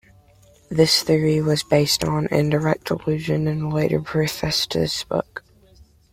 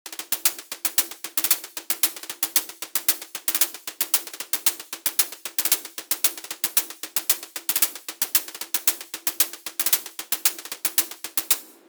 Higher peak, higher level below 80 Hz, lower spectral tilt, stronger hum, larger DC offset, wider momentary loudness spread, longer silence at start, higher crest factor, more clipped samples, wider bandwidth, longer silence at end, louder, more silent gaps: about the same, -4 dBFS vs -2 dBFS; first, -48 dBFS vs -80 dBFS; first, -5 dB/octave vs 2.5 dB/octave; neither; neither; about the same, 8 LU vs 6 LU; first, 0.7 s vs 0.05 s; about the same, 18 dB vs 22 dB; neither; second, 16.5 kHz vs over 20 kHz; first, 0.75 s vs 0.15 s; first, -20 LUFS vs -23 LUFS; neither